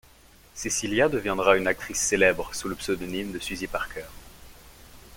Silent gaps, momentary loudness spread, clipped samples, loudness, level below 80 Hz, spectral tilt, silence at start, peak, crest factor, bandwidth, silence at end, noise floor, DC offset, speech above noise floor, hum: none; 14 LU; under 0.1%; -25 LUFS; -48 dBFS; -3 dB/octave; 0.55 s; -4 dBFS; 24 dB; 17 kHz; 0 s; -54 dBFS; under 0.1%; 28 dB; none